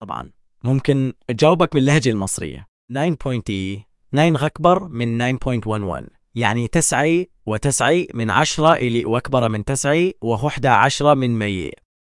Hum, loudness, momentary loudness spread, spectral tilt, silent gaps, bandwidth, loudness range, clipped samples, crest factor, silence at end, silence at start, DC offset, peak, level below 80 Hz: none; -19 LUFS; 12 LU; -5 dB/octave; 2.68-2.88 s; 12 kHz; 3 LU; under 0.1%; 18 dB; 0.3 s; 0 s; under 0.1%; 0 dBFS; -42 dBFS